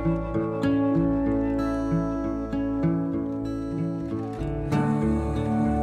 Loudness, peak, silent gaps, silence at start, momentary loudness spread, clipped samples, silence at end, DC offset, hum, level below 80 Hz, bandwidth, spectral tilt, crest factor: -26 LUFS; -12 dBFS; none; 0 s; 7 LU; under 0.1%; 0 s; under 0.1%; none; -38 dBFS; 9.6 kHz; -9 dB/octave; 12 dB